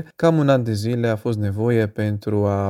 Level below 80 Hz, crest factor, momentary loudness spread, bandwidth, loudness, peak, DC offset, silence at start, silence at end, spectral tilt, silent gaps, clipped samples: -56 dBFS; 16 dB; 5 LU; 14 kHz; -20 LUFS; -4 dBFS; under 0.1%; 0 s; 0 s; -8 dB/octave; none; under 0.1%